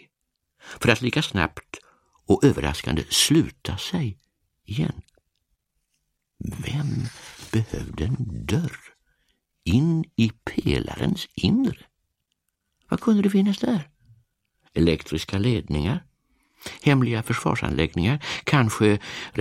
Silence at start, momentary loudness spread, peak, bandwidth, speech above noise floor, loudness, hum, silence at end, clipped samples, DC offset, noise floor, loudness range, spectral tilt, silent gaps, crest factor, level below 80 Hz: 0.65 s; 13 LU; 0 dBFS; 16 kHz; 55 dB; -24 LUFS; none; 0 s; under 0.1%; under 0.1%; -78 dBFS; 8 LU; -5.5 dB/octave; none; 24 dB; -42 dBFS